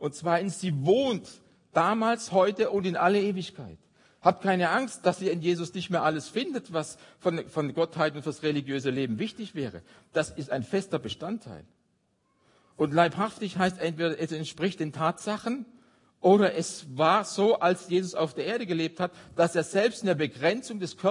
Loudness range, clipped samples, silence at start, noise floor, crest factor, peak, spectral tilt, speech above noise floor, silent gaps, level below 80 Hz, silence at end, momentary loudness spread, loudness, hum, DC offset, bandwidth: 5 LU; under 0.1%; 0 s; -72 dBFS; 22 dB; -6 dBFS; -5.5 dB/octave; 44 dB; none; -70 dBFS; 0 s; 10 LU; -28 LUFS; none; under 0.1%; 11 kHz